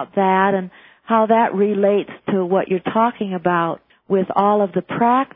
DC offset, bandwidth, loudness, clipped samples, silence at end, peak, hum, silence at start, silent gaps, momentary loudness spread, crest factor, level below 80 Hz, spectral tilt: under 0.1%; 3.9 kHz; -18 LUFS; under 0.1%; 0.1 s; -2 dBFS; none; 0 s; none; 7 LU; 16 dB; -64 dBFS; -11 dB/octave